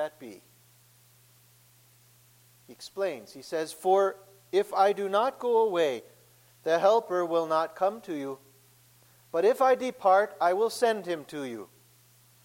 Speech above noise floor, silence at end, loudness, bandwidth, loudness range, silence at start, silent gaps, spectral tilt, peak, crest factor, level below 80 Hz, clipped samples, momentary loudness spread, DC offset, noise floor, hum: 33 dB; 0.8 s; -27 LUFS; 16.5 kHz; 9 LU; 0 s; none; -4 dB/octave; -10 dBFS; 18 dB; -78 dBFS; under 0.1%; 16 LU; under 0.1%; -60 dBFS; none